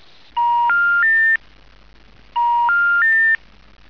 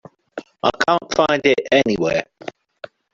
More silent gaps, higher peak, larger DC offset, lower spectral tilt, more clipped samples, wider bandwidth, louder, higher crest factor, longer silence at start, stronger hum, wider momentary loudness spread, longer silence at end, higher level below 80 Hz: neither; second, -10 dBFS vs 0 dBFS; first, 0.4% vs under 0.1%; second, -2.5 dB/octave vs -4.5 dB/octave; neither; second, 5.4 kHz vs 7.8 kHz; first, -15 LUFS vs -18 LUFS; second, 8 dB vs 20 dB; about the same, 0.35 s vs 0.35 s; neither; second, 8 LU vs 20 LU; about the same, 0.55 s vs 0.65 s; about the same, -52 dBFS vs -54 dBFS